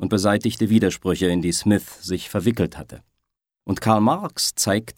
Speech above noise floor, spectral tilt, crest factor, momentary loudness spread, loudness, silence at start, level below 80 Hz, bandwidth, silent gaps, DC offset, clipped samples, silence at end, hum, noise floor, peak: 59 dB; -5 dB/octave; 20 dB; 10 LU; -21 LUFS; 0 s; -50 dBFS; 17 kHz; none; under 0.1%; under 0.1%; 0.05 s; none; -79 dBFS; -2 dBFS